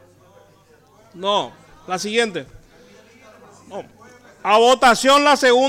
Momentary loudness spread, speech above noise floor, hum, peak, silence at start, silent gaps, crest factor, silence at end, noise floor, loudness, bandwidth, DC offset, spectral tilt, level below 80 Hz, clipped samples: 23 LU; 36 dB; none; -6 dBFS; 1.15 s; none; 14 dB; 0 s; -52 dBFS; -16 LUFS; 17 kHz; under 0.1%; -2.5 dB/octave; -54 dBFS; under 0.1%